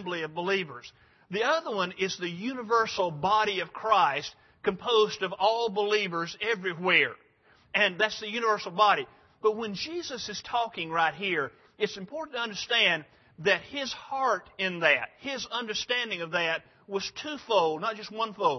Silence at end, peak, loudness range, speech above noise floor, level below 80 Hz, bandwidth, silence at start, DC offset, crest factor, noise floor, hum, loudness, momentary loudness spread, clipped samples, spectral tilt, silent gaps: 0 s; -8 dBFS; 3 LU; 33 dB; -70 dBFS; 6.4 kHz; 0 s; under 0.1%; 22 dB; -62 dBFS; none; -28 LUFS; 11 LU; under 0.1%; -3.5 dB/octave; none